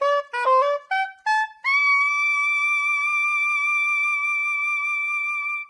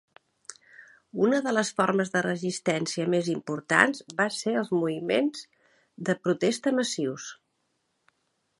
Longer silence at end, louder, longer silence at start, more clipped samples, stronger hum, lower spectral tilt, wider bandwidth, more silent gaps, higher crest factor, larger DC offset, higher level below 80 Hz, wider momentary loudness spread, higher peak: second, 0 s vs 1.25 s; first, -20 LUFS vs -26 LUFS; second, 0 s vs 0.5 s; neither; neither; second, 4 dB/octave vs -4.5 dB/octave; about the same, 11 kHz vs 11.5 kHz; neither; second, 12 dB vs 26 dB; neither; second, -88 dBFS vs -74 dBFS; second, 5 LU vs 16 LU; second, -10 dBFS vs -2 dBFS